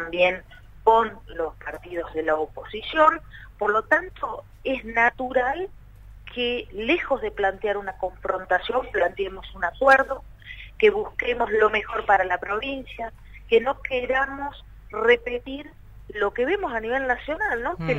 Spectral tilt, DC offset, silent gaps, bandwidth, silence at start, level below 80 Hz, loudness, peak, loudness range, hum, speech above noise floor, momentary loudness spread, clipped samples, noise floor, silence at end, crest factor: -5.5 dB/octave; under 0.1%; none; 9.4 kHz; 0 s; -46 dBFS; -24 LUFS; -4 dBFS; 3 LU; none; 20 dB; 14 LU; under 0.1%; -44 dBFS; 0 s; 20 dB